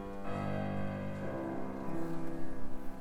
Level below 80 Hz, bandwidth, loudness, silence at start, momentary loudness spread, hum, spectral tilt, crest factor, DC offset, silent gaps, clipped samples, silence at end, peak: -50 dBFS; 11.5 kHz; -40 LUFS; 0 s; 7 LU; none; -8 dB/octave; 12 dB; under 0.1%; none; under 0.1%; 0 s; -22 dBFS